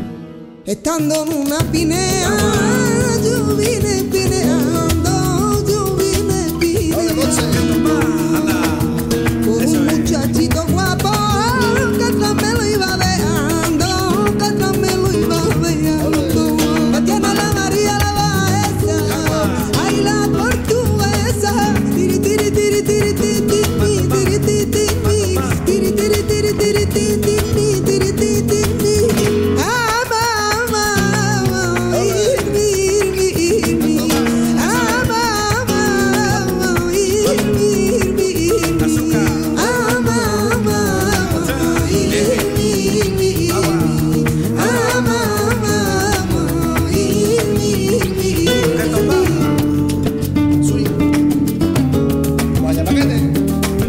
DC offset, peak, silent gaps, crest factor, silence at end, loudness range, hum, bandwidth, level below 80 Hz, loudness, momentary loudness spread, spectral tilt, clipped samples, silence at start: under 0.1%; -4 dBFS; none; 10 dB; 0 s; 1 LU; none; 16.5 kHz; -32 dBFS; -15 LUFS; 2 LU; -5 dB/octave; under 0.1%; 0 s